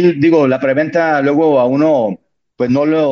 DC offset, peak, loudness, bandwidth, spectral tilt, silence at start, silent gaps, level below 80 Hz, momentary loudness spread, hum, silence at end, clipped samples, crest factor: under 0.1%; 0 dBFS; -13 LUFS; 6.8 kHz; -8 dB/octave; 0 s; none; -56 dBFS; 7 LU; none; 0 s; under 0.1%; 12 dB